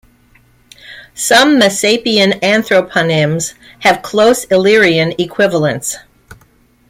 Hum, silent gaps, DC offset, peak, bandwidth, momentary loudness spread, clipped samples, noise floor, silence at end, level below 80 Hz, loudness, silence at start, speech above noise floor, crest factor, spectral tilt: none; none; under 0.1%; 0 dBFS; 16.5 kHz; 11 LU; under 0.1%; -50 dBFS; 0.55 s; -50 dBFS; -11 LUFS; 0.9 s; 39 dB; 14 dB; -3.5 dB/octave